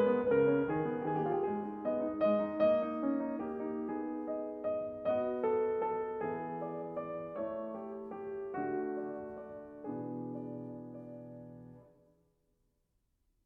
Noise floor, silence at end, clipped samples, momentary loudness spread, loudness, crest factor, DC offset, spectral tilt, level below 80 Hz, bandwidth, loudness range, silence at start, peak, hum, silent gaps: -78 dBFS; 1.65 s; under 0.1%; 16 LU; -36 LUFS; 18 dB; under 0.1%; -10 dB/octave; -70 dBFS; 4.8 kHz; 12 LU; 0 s; -18 dBFS; none; none